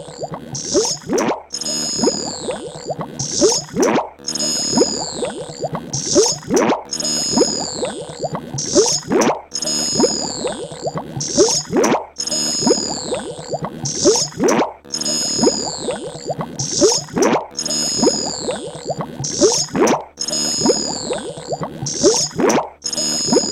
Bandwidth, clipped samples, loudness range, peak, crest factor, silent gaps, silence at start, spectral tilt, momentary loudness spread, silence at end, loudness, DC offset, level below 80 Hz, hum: 17 kHz; under 0.1%; 1 LU; 0 dBFS; 18 dB; none; 0 s; -2.5 dB/octave; 11 LU; 0 s; -18 LUFS; under 0.1%; -50 dBFS; none